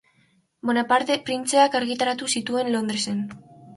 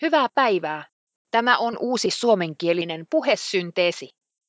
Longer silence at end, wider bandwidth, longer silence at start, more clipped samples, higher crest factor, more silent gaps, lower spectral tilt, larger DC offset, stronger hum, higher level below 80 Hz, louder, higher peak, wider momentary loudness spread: second, 0 s vs 0.4 s; first, 12 kHz vs 8 kHz; first, 0.65 s vs 0 s; neither; about the same, 18 dB vs 20 dB; second, none vs 0.92-1.07 s, 1.16-1.25 s; about the same, -3 dB/octave vs -4 dB/octave; neither; neither; first, -68 dBFS vs -76 dBFS; about the same, -23 LUFS vs -22 LUFS; second, -6 dBFS vs -2 dBFS; first, 9 LU vs 6 LU